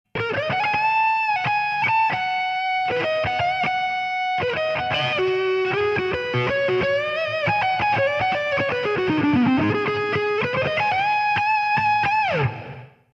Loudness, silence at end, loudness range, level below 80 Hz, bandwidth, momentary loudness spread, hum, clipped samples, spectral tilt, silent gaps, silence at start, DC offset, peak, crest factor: -21 LUFS; 0.3 s; 2 LU; -54 dBFS; 8 kHz; 4 LU; none; under 0.1%; -6 dB/octave; none; 0.15 s; under 0.1%; -10 dBFS; 12 dB